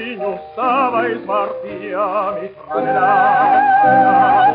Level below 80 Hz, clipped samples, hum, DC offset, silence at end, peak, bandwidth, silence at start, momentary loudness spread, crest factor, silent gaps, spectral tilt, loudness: -58 dBFS; under 0.1%; none; under 0.1%; 0 s; -2 dBFS; 5 kHz; 0 s; 13 LU; 12 dB; none; -3 dB/octave; -15 LUFS